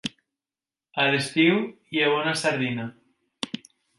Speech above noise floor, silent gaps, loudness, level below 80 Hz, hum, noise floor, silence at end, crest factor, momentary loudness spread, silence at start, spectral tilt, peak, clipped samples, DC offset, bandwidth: over 66 dB; none; -24 LUFS; -72 dBFS; none; under -90 dBFS; 0.4 s; 18 dB; 15 LU; 0.05 s; -4.5 dB/octave; -8 dBFS; under 0.1%; under 0.1%; 11.5 kHz